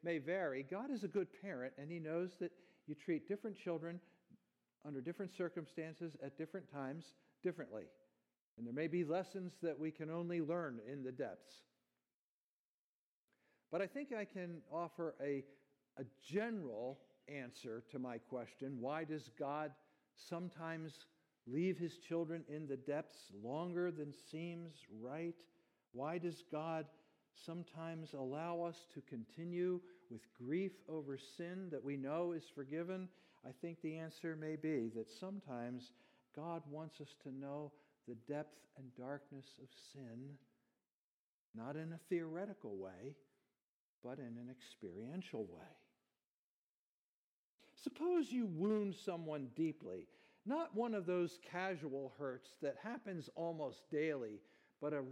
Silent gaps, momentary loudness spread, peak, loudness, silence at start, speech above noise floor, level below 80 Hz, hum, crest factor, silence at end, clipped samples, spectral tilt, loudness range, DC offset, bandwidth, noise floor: 8.41-8.57 s, 12.14-13.28 s, 40.94-41.54 s, 43.62-44.02 s, 46.25-47.58 s; 14 LU; -28 dBFS; -46 LUFS; 0.05 s; over 45 dB; under -90 dBFS; none; 18 dB; 0 s; under 0.1%; -7 dB/octave; 8 LU; under 0.1%; 13.5 kHz; under -90 dBFS